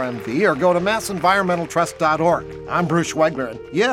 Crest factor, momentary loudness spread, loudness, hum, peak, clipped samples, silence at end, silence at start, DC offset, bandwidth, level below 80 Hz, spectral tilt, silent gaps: 16 dB; 7 LU; -19 LUFS; none; -4 dBFS; under 0.1%; 0 s; 0 s; under 0.1%; 16 kHz; -50 dBFS; -5 dB/octave; none